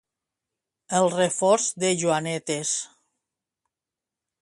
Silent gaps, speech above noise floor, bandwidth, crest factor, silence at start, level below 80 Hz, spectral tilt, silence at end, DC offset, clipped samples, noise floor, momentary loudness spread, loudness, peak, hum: none; 65 dB; 11.5 kHz; 20 dB; 0.9 s; -70 dBFS; -3.5 dB/octave; 1.55 s; under 0.1%; under 0.1%; -89 dBFS; 7 LU; -23 LUFS; -8 dBFS; none